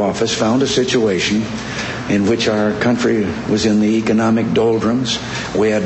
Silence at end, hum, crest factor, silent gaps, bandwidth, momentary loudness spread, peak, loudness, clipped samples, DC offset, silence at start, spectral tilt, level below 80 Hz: 0 s; none; 14 dB; none; 8.4 kHz; 5 LU; -2 dBFS; -16 LUFS; under 0.1%; under 0.1%; 0 s; -5 dB/octave; -44 dBFS